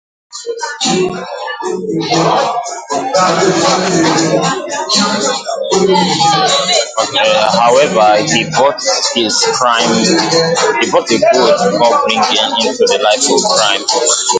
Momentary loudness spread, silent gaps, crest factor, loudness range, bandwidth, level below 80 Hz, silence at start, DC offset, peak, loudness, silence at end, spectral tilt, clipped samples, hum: 9 LU; none; 12 dB; 3 LU; 9.6 kHz; -54 dBFS; 0.35 s; under 0.1%; 0 dBFS; -11 LUFS; 0 s; -2.5 dB/octave; under 0.1%; none